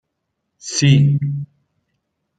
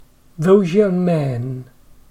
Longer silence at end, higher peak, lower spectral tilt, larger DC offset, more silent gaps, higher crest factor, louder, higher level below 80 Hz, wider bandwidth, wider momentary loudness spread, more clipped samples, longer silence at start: first, 0.95 s vs 0.45 s; about the same, -2 dBFS vs -2 dBFS; second, -5 dB/octave vs -8.5 dB/octave; neither; neither; about the same, 18 dB vs 16 dB; about the same, -16 LUFS vs -17 LUFS; second, -56 dBFS vs -50 dBFS; second, 9.2 kHz vs 11.5 kHz; first, 21 LU vs 14 LU; neither; first, 0.65 s vs 0.4 s